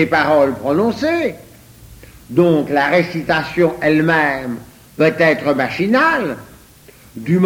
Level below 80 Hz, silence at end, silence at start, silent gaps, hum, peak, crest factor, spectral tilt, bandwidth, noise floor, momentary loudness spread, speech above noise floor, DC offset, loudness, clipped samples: -48 dBFS; 0 s; 0 s; none; none; 0 dBFS; 16 dB; -6.5 dB/octave; 17 kHz; -44 dBFS; 11 LU; 29 dB; under 0.1%; -15 LUFS; under 0.1%